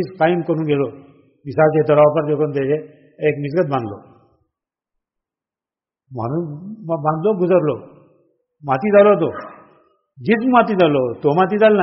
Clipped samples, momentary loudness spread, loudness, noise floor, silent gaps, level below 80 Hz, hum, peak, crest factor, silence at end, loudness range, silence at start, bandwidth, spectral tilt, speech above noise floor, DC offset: under 0.1%; 16 LU; -17 LUFS; under -90 dBFS; none; -60 dBFS; none; -2 dBFS; 16 dB; 0 s; 10 LU; 0 s; 5.8 kHz; -6 dB/octave; over 74 dB; under 0.1%